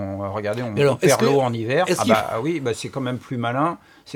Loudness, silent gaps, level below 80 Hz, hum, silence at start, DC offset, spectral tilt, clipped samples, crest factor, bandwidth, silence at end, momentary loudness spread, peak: -21 LUFS; none; -60 dBFS; none; 0 s; under 0.1%; -5 dB/octave; under 0.1%; 20 dB; 18.5 kHz; 0 s; 10 LU; -2 dBFS